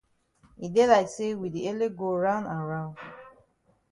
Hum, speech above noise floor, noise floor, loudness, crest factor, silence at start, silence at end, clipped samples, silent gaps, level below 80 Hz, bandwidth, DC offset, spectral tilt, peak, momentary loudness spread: none; 41 dB; -67 dBFS; -27 LUFS; 20 dB; 0.6 s; 0.6 s; under 0.1%; none; -64 dBFS; 11.5 kHz; under 0.1%; -6 dB/octave; -8 dBFS; 19 LU